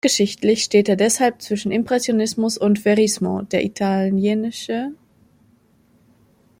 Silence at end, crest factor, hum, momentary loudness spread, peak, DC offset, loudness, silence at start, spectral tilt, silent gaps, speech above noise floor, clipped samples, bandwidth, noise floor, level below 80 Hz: 1.65 s; 16 dB; none; 8 LU; -4 dBFS; under 0.1%; -19 LUFS; 0.05 s; -4.5 dB/octave; none; 38 dB; under 0.1%; 16.5 kHz; -57 dBFS; -60 dBFS